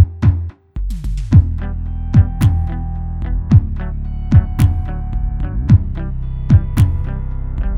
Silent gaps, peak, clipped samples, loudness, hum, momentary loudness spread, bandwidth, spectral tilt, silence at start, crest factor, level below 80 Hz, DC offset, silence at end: none; 0 dBFS; under 0.1%; -17 LUFS; none; 12 LU; 13 kHz; -8.5 dB/octave; 0 s; 14 dB; -20 dBFS; under 0.1%; 0 s